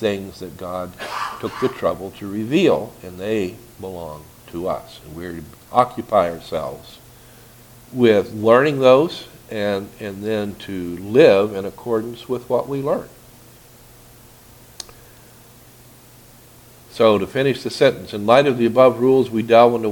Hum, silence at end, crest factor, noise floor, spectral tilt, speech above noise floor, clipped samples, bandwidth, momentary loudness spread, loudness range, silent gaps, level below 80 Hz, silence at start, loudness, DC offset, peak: none; 0 s; 20 dB; -46 dBFS; -6 dB/octave; 28 dB; under 0.1%; 19 kHz; 20 LU; 9 LU; none; -52 dBFS; 0 s; -18 LUFS; under 0.1%; 0 dBFS